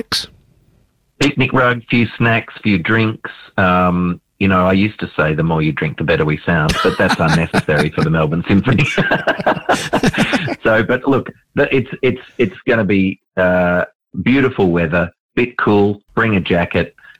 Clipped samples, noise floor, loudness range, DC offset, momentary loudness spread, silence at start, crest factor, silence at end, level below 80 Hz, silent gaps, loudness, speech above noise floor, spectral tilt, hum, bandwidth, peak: under 0.1%; -57 dBFS; 2 LU; under 0.1%; 6 LU; 0.1 s; 10 dB; 0.3 s; -40 dBFS; 13.95-14.00 s, 15.20-15.29 s; -15 LUFS; 42 dB; -6 dB/octave; none; 15 kHz; -4 dBFS